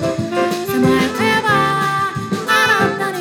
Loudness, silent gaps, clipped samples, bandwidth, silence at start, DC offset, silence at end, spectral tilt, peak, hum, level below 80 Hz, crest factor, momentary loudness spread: -15 LUFS; none; under 0.1%; 18 kHz; 0 s; under 0.1%; 0 s; -4.5 dB/octave; -4 dBFS; none; -48 dBFS; 12 dB; 6 LU